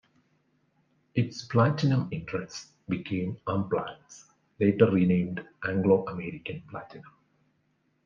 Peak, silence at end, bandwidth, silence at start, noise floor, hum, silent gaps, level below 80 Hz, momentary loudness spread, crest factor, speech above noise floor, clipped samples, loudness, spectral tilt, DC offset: -8 dBFS; 1.05 s; 7.4 kHz; 1.15 s; -72 dBFS; none; none; -66 dBFS; 18 LU; 22 dB; 44 dB; under 0.1%; -28 LUFS; -7.5 dB/octave; under 0.1%